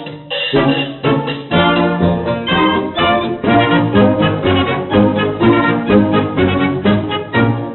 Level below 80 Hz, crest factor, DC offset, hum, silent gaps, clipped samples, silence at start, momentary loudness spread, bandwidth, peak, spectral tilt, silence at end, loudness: -40 dBFS; 12 dB; under 0.1%; none; none; under 0.1%; 0 s; 5 LU; 4.2 kHz; 0 dBFS; -4.5 dB/octave; 0 s; -14 LUFS